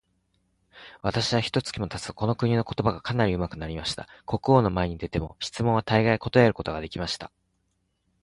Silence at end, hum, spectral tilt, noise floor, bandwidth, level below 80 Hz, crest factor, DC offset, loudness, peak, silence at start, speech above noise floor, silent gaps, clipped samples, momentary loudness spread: 0.95 s; none; -6 dB/octave; -73 dBFS; 11.5 kHz; -46 dBFS; 22 dB; under 0.1%; -26 LUFS; -6 dBFS; 0.75 s; 48 dB; none; under 0.1%; 11 LU